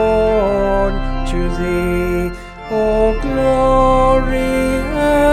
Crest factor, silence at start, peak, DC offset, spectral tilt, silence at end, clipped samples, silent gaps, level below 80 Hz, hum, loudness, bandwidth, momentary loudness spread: 12 dB; 0 s; -2 dBFS; under 0.1%; -6.5 dB/octave; 0 s; under 0.1%; none; -22 dBFS; none; -16 LUFS; 14 kHz; 9 LU